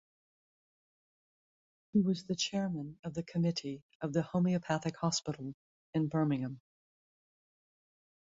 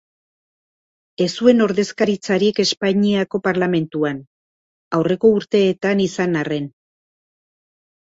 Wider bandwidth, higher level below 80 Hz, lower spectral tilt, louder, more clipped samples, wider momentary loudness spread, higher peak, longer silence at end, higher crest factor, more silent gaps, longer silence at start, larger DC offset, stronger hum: about the same, 7.8 kHz vs 8 kHz; second, -70 dBFS vs -60 dBFS; about the same, -5.5 dB/octave vs -5.5 dB/octave; second, -35 LUFS vs -18 LUFS; neither; about the same, 10 LU vs 8 LU; second, -18 dBFS vs -2 dBFS; first, 1.7 s vs 1.3 s; about the same, 20 dB vs 18 dB; second, 2.99-3.03 s, 3.82-3.89 s, 3.95-4.00 s, 5.54-5.93 s vs 4.27-4.91 s; first, 1.95 s vs 1.2 s; neither; neither